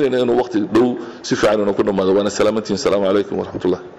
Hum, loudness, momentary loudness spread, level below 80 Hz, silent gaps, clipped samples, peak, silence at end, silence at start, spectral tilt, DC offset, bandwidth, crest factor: none; -17 LUFS; 5 LU; -50 dBFS; none; under 0.1%; -8 dBFS; 0 s; 0 s; -5.5 dB/octave; under 0.1%; 11 kHz; 8 dB